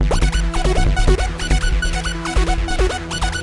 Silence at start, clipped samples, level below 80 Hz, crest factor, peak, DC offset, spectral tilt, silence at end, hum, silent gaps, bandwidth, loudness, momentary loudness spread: 0 s; under 0.1%; -18 dBFS; 12 dB; -4 dBFS; under 0.1%; -4.5 dB/octave; 0 s; none; none; 11.5 kHz; -20 LUFS; 4 LU